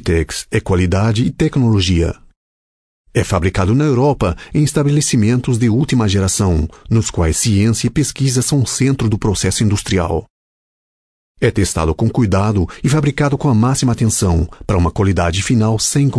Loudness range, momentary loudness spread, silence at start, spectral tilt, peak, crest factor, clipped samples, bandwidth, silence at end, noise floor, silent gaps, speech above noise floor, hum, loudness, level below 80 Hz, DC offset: 3 LU; 4 LU; 0 s; -5.5 dB/octave; -2 dBFS; 14 dB; under 0.1%; 11 kHz; 0 s; under -90 dBFS; 2.36-3.04 s, 10.30-11.35 s; over 76 dB; none; -15 LUFS; -30 dBFS; under 0.1%